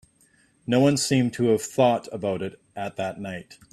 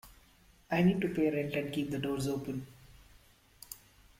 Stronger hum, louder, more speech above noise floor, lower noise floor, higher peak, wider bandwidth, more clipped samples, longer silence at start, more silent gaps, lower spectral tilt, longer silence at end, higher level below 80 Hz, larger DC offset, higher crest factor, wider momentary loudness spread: neither; first, -24 LUFS vs -33 LUFS; first, 38 dB vs 31 dB; about the same, -61 dBFS vs -63 dBFS; first, -6 dBFS vs -16 dBFS; second, 14.5 kHz vs 16.5 kHz; neither; first, 0.7 s vs 0.05 s; neither; about the same, -5.5 dB/octave vs -6.5 dB/octave; second, 0.2 s vs 0.45 s; about the same, -62 dBFS vs -60 dBFS; neither; about the same, 18 dB vs 18 dB; second, 15 LU vs 20 LU